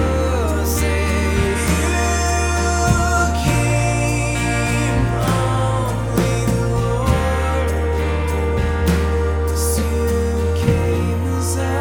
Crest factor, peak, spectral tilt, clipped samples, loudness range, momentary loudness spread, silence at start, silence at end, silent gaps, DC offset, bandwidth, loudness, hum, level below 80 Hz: 16 dB; -2 dBFS; -5.5 dB/octave; under 0.1%; 2 LU; 3 LU; 0 s; 0 s; none; under 0.1%; 18.5 kHz; -18 LUFS; none; -24 dBFS